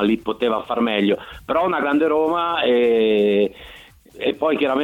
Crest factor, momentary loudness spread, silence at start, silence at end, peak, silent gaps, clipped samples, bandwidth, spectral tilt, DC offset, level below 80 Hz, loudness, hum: 14 dB; 8 LU; 0 s; 0 s; -4 dBFS; none; under 0.1%; 15.5 kHz; -6.5 dB/octave; under 0.1%; -52 dBFS; -19 LUFS; none